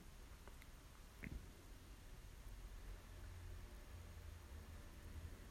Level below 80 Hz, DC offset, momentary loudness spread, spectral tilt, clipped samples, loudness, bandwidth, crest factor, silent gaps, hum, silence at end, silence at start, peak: -58 dBFS; under 0.1%; 6 LU; -5 dB/octave; under 0.1%; -59 LUFS; 16 kHz; 20 dB; none; none; 0 s; 0 s; -36 dBFS